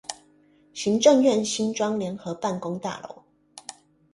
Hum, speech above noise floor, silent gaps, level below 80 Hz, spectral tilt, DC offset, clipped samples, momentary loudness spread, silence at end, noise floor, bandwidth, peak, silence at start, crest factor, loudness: none; 36 dB; none; -68 dBFS; -4.5 dB/octave; under 0.1%; under 0.1%; 24 LU; 0.55 s; -59 dBFS; 11.5 kHz; -4 dBFS; 0.1 s; 20 dB; -24 LUFS